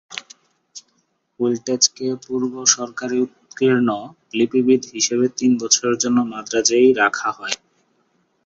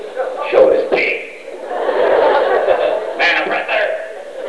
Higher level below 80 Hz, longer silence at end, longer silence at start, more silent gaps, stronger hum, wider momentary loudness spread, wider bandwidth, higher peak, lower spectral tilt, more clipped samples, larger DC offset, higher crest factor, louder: second, -64 dBFS vs -56 dBFS; first, 0.9 s vs 0 s; about the same, 0.1 s vs 0 s; neither; neither; about the same, 12 LU vs 13 LU; second, 7.8 kHz vs 11 kHz; about the same, 0 dBFS vs 0 dBFS; about the same, -2.5 dB/octave vs -3.5 dB/octave; neither; second, under 0.1% vs 0.6%; about the same, 20 dB vs 16 dB; second, -19 LUFS vs -15 LUFS